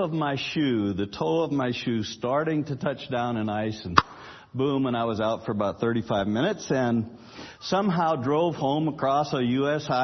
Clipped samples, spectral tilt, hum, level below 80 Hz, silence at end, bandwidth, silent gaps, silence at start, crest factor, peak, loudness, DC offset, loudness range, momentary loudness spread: under 0.1%; -6.5 dB/octave; none; -58 dBFS; 0 s; 6.4 kHz; none; 0 s; 26 dB; 0 dBFS; -26 LUFS; under 0.1%; 1 LU; 5 LU